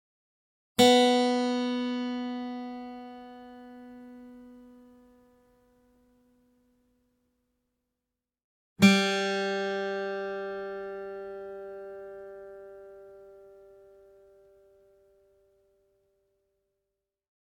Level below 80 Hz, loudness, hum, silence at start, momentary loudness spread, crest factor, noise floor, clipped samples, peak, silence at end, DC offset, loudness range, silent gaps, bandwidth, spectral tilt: -72 dBFS; -27 LUFS; none; 0.8 s; 27 LU; 26 dB; -88 dBFS; under 0.1%; -8 dBFS; 3.95 s; under 0.1%; 23 LU; 8.44-8.76 s; 17 kHz; -4.5 dB/octave